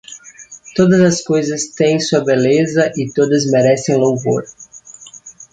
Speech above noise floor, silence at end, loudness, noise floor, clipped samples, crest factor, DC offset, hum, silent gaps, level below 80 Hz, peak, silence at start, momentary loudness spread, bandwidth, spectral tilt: 25 dB; 0.1 s; -14 LUFS; -39 dBFS; under 0.1%; 14 dB; under 0.1%; none; none; -56 dBFS; 0 dBFS; 0.1 s; 22 LU; 9.4 kHz; -5.5 dB/octave